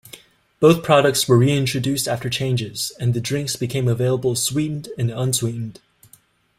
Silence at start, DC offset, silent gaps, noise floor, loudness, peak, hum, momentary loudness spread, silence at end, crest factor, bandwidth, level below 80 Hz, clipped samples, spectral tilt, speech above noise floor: 0.15 s; under 0.1%; none; -55 dBFS; -20 LUFS; -2 dBFS; none; 10 LU; 0.85 s; 18 dB; 16 kHz; -54 dBFS; under 0.1%; -5 dB/octave; 35 dB